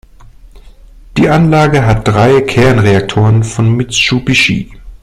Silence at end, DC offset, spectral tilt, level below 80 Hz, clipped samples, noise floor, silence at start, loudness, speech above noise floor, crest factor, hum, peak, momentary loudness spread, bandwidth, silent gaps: 0.05 s; under 0.1%; -5.5 dB/octave; -30 dBFS; under 0.1%; -36 dBFS; 0.45 s; -10 LUFS; 27 dB; 10 dB; none; 0 dBFS; 4 LU; 12 kHz; none